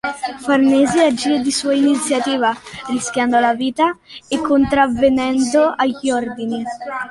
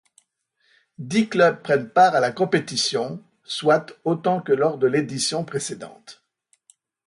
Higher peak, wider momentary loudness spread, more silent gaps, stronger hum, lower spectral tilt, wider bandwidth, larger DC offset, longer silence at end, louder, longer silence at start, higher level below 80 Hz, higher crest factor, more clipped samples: about the same, -2 dBFS vs -4 dBFS; second, 10 LU vs 14 LU; neither; neither; about the same, -3.5 dB/octave vs -4 dB/octave; about the same, 11.5 kHz vs 11.5 kHz; neither; second, 0 s vs 0.95 s; first, -17 LUFS vs -21 LUFS; second, 0.05 s vs 1 s; first, -48 dBFS vs -68 dBFS; about the same, 14 dB vs 18 dB; neither